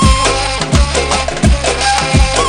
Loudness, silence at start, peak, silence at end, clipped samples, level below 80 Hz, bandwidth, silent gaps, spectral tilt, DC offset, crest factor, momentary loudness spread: -12 LUFS; 0 s; 0 dBFS; 0 s; 0.3%; -16 dBFS; 10.5 kHz; none; -4 dB/octave; under 0.1%; 12 dB; 2 LU